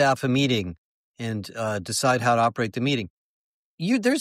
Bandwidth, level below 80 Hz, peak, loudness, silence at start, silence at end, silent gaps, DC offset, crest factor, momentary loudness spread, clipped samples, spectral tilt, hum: 16 kHz; -60 dBFS; -8 dBFS; -24 LUFS; 0 s; 0 s; 0.78-1.14 s, 3.10-3.78 s; under 0.1%; 16 dB; 11 LU; under 0.1%; -5 dB/octave; none